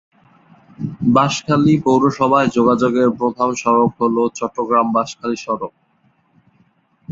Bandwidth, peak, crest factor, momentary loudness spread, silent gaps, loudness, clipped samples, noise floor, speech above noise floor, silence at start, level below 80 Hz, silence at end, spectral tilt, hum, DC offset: 7.8 kHz; -2 dBFS; 16 dB; 10 LU; none; -16 LUFS; under 0.1%; -59 dBFS; 44 dB; 0.8 s; -54 dBFS; 0 s; -6 dB/octave; none; under 0.1%